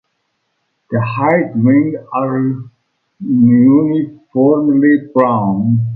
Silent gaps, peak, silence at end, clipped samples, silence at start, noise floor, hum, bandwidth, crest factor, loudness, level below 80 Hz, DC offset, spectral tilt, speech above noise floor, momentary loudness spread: none; 0 dBFS; 0 s; under 0.1%; 0.9 s; -67 dBFS; none; 4.4 kHz; 12 dB; -13 LUFS; -54 dBFS; under 0.1%; -12 dB/octave; 55 dB; 10 LU